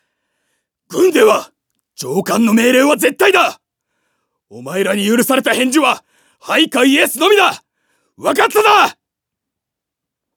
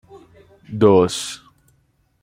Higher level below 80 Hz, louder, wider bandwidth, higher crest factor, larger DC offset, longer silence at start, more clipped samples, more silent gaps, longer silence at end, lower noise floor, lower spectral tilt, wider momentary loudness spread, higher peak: second, -70 dBFS vs -56 dBFS; first, -13 LUFS vs -17 LUFS; first, over 20 kHz vs 15.5 kHz; second, 14 dB vs 20 dB; neither; first, 0.9 s vs 0.15 s; neither; neither; first, 1.45 s vs 0.85 s; first, -81 dBFS vs -62 dBFS; second, -3 dB/octave vs -5.5 dB/octave; second, 11 LU vs 20 LU; about the same, 0 dBFS vs -2 dBFS